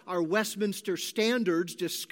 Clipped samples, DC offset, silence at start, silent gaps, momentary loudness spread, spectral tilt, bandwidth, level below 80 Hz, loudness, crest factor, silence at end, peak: under 0.1%; under 0.1%; 0.05 s; none; 6 LU; -4 dB/octave; 17 kHz; -86 dBFS; -29 LUFS; 16 dB; 0.05 s; -12 dBFS